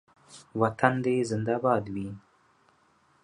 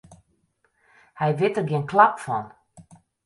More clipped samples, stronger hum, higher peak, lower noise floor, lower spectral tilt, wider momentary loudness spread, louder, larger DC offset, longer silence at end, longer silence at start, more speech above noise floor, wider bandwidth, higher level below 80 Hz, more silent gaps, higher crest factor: neither; neither; about the same, -4 dBFS vs -2 dBFS; about the same, -65 dBFS vs -68 dBFS; about the same, -7 dB/octave vs -7 dB/octave; about the same, 14 LU vs 12 LU; second, -28 LUFS vs -22 LUFS; neither; first, 1.05 s vs 0.45 s; first, 0.3 s vs 0.1 s; second, 38 dB vs 47 dB; about the same, 10.5 kHz vs 11.5 kHz; about the same, -62 dBFS vs -66 dBFS; neither; about the same, 26 dB vs 24 dB